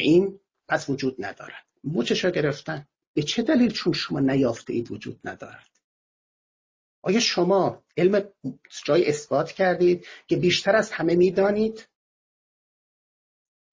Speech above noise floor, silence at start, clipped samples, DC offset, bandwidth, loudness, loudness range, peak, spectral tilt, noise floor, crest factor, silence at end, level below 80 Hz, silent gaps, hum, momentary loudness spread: over 67 dB; 0 s; under 0.1%; under 0.1%; 7.6 kHz; -23 LUFS; 5 LU; -8 dBFS; -5 dB/octave; under -90 dBFS; 18 dB; 1.9 s; -60 dBFS; 3.07-3.14 s, 5.84-7.02 s; none; 16 LU